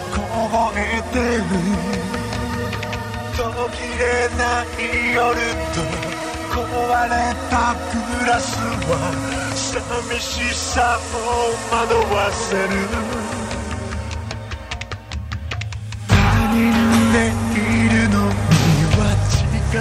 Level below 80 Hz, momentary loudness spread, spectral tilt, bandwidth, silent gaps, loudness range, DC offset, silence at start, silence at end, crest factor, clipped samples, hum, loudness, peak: -30 dBFS; 11 LU; -5 dB/octave; 15.5 kHz; none; 6 LU; under 0.1%; 0 s; 0 s; 20 dB; under 0.1%; none; -20 LUFS; 0 dBFS